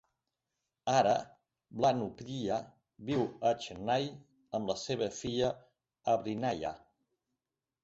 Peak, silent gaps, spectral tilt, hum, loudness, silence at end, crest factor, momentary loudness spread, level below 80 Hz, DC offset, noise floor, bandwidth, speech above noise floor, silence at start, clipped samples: -16 dBFS; none; -5 dB/octave; none; -34 LUFS; 1.05 s; 20 dB; 11 LU; -66 dBFS; under 0.1%; -90 dBFS; 8 kHz; 57 dB; 0.85 s; under 0.1%